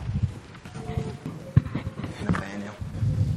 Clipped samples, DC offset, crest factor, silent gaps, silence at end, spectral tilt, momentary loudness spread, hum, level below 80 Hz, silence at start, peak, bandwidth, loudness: under 0.1%; under 0.1%; 24 dB; none; 0 s; -7.5 dB/octave; 12 LU; none; -40 dBFS; 0 s; -4 dBFS; 11.5 kHz; -30 LUFS